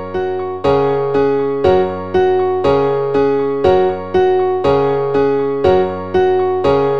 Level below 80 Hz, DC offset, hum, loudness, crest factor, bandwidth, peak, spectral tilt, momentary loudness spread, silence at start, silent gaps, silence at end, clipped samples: -42 dBFS; 2%; none; -15 LUFS; 14 dB; 6.6 kHz; -2 dBFS; -8 dB/octave; 2 LU; 0 s; none; 0 s; under 0.1%